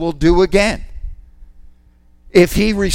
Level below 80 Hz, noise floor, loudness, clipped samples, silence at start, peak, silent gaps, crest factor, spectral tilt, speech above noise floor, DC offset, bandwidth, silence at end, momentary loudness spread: -26 dBFS; -49 dBFS; -14 LUFS; under 0.1%; 0 s; 0 dBFS; none; 16 dB; -5.5 dB/octave; 36 dB; under 0.1%; 16.5 kHz; 0 s; 23 LU